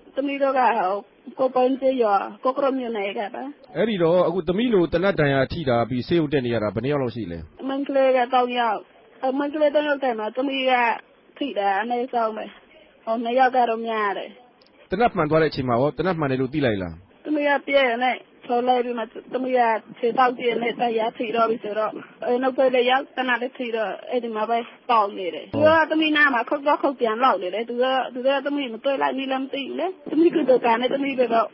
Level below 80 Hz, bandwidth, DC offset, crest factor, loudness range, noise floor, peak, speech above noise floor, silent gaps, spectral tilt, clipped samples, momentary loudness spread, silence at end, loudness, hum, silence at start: -54 dBFS; 5.8 kHz; under 0.1%; 16 dB; 3 LU; -53 dBFS; -6 dBFS; 31 dB; none; -10.5 dB/octave; under 0.1%; 10 LU; 0.05 s; -22 LUFS; none; 0.15 s